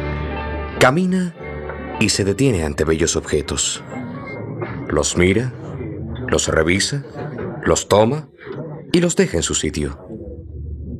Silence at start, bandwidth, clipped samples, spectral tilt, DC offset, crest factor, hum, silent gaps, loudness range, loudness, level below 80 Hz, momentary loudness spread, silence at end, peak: 0 s; 14.5 kHz; under 0.1%; -4.5 dB/octave; under 0.1%; 18 dB; none; none; 2 LU; -19 LUFS; -36 dBFS; 15 LU; 0 s; 0 dBFS